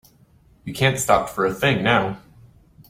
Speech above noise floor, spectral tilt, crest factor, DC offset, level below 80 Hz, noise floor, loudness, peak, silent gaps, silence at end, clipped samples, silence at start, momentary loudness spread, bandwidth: 35 dB; -4.5 dB/octave; 22 dB; under 0.1%; -50 dBFS; -55 dBFS; -20 LUFS; -2 dBFS; none; 0.7 s; under 0.1%; 0.65 s; 18 LU; 16.5 kHz